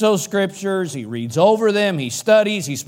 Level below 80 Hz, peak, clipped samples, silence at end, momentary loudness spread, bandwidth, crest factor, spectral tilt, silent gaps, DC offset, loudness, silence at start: -66 dBFS; -2 dBFS; under 0.1%; 0.05 s; 9 LU; 17 kHz; 16 dB; -4.5 dB/octave; none; under 0.1%; -18 LUFS; 0 s